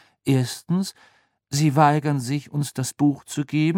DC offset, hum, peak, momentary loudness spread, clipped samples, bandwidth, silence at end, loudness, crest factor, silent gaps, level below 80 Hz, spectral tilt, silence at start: under 0.1%; none; -2 dBFS; 10 LU; under 0.1%; 16.5 kHz; 0 s; -23 LUFS; 20 dB; none; -66 dBFS; -6 dB/octave; 0.25 s